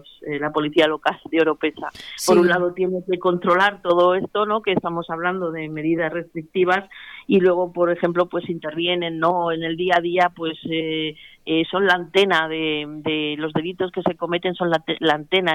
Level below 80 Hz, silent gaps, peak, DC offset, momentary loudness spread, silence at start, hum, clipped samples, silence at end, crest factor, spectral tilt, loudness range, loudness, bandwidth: -60 dBFS; none; -6 dBFS; under 0.1%; 9 LU; 0.2 s; none; under 0.1%; 0 s; 16 dB; -5 dB/octave; 3 LU; -21 LUFS; 14.5 kHz